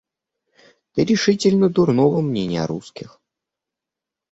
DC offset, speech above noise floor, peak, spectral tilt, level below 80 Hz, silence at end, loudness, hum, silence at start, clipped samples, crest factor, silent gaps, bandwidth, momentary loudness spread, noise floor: under 0.1%; 68 dB; -4 dBFS; -6 dB/octave; -56 dBFS; 1.3 s; -18 LUFS; none; 0.95 s; under 0.1%; 16 dB; none; 8 kHz; 13 LU; -86 dBFS